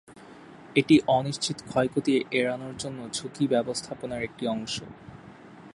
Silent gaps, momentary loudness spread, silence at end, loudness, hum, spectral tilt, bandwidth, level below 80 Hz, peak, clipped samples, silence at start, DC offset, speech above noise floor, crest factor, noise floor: none; 15 LU; 0.05 s; -27 LUFS; none; -5 dB/octave; 11.5 kHz; -60 dBFS; -8 dBFS; under 0.1%; 0.1 s; under 0.1%; 21 dB; 20 dB; -48 dBFS